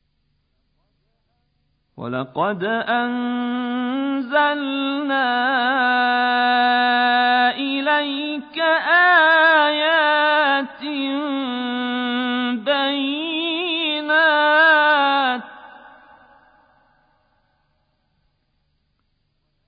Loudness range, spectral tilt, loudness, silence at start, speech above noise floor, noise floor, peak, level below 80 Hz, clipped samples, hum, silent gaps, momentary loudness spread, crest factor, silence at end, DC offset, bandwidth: 8 LU; -8 dB/octave; -18 LUFS; 2 s; 49 dB; -68 dBFS; -4 dBFS; -70 dBFS; under 0.1%; none; none; 11 LU; 16 dB; 3.95 s; under 0.1%; 5.2 kHz